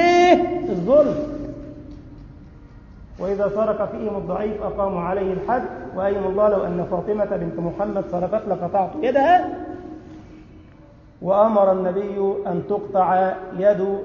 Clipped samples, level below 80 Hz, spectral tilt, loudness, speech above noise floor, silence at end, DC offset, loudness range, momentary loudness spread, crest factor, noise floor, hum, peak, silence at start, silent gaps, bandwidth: under 0.1%; -46 dBFS; -7 dB/octave; -21 LUFS; 26 dB; 0 s; under 0.1%; 5 LU; 16 LU; 20 dB; -46 dBFS; none; -2 dBFS; 0 s; none; 7.2 kHz